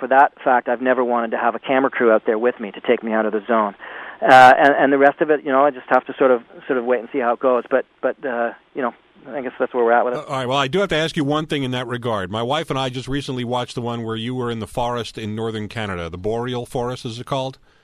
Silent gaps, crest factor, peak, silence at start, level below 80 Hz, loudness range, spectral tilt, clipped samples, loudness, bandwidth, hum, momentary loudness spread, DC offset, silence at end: none; 18 dB; 0 dBFS; 0 s; -50 dBFS; 10 LU; -5.5 dB/octave; under 0.1%; -19 LUFS; 13.5 kHz; none; 11 LU; under 0.1%; 0.3 s